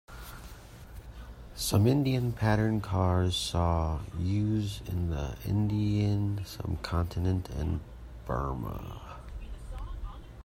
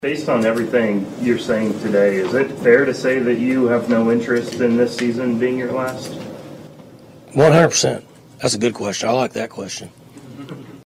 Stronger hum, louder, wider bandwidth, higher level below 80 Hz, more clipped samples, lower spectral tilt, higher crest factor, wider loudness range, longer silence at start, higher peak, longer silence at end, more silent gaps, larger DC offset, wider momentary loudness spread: neither; second, -30 LUFS vs -18 LUFS; about the same, 16 kHz vs 15.5 kHz; first, -42 dBFS vs -56 dBFS; neither; first, -6.5 dB/octave vs -5 dB/octave; about the same, 18 dB vs 18 dB; first, 6 LU vs 3 LU; about the same, 0.1 s vs 0 s; second, -12 dBFS vs -2 dBFS; about the same, 0 s vs 0.1 s; neither; neither; about the same, 19 LU vs 17 LU